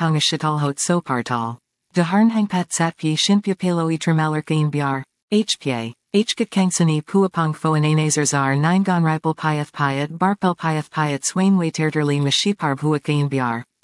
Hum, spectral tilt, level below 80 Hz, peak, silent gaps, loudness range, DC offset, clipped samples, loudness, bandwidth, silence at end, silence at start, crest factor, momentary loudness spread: none; -5 dB/octave; -70 dBFS; -4 dBFS; 5.23-5.28 s; 2 LU; under 0.1%; under 0.1%; -20 LUFS; 12 kHz; 0.2 s; 0 s; 14 dB; 5 LU